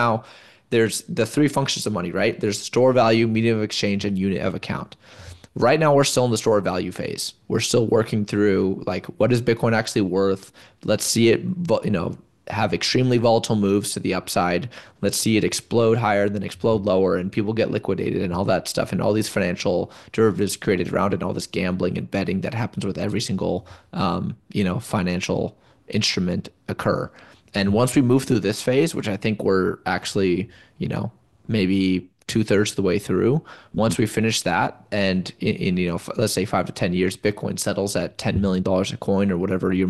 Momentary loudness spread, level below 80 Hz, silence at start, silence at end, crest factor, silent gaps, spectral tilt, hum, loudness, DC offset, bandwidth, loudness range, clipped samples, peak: 9 LU; -52 dBFS; 0 s; 0 s; 16 dB; none; -5 dB/octave; none; -22 LUFS; 0.2%; 12.5 kHz; 4 LU; under 0.1%; -6 dBFS